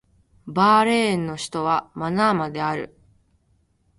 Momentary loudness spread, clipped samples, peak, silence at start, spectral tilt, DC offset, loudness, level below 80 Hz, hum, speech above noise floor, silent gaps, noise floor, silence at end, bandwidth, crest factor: 12 LU; under 0.1%; -6 dBFS; 0.45 s; -5.5 dB/octave; under 0.1%; -21 LUFS; -58 dBFS; none; 43 dB; none; -64 dBFS; 1.1 s; 11.5 kHz; 18 dB